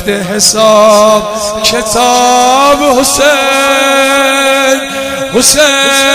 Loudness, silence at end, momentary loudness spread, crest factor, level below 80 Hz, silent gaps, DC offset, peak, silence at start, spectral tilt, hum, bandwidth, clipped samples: -7 LUFS; 0 s; 6 LU; 8 dB; -38 dBFS; none; under 0.1%; 0 dBFS; 0 s; -1.5 dB/octave; none; over 20 kHz; 2%